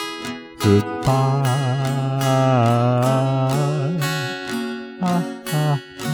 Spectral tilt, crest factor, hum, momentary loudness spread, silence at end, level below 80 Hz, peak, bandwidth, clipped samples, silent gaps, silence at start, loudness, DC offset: -6.5 dB/octave; 16 dB; none; 9 LU; 0 s; -52 dBFS; -4 dBFS; over 20 kHz; under 0.1%; none; 0 s; -20 LUFS; under 0.1%